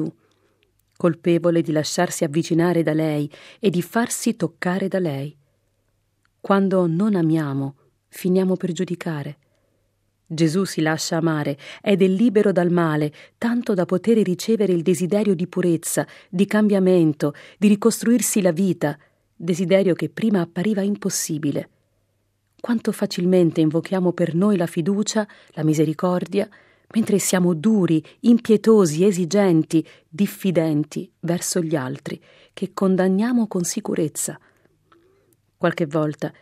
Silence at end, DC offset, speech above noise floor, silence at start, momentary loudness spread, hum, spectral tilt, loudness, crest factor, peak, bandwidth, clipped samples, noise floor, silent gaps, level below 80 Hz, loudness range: 0.1 s; under 0.1%; 48 dB; 0 s; 10 LU; none; -6 dB/octave; -21 LUFS; 18 dB; -2 dBFS; 16 kHz; under 0.1%; -68 dBFS; none; -70 dBFS; 5 LU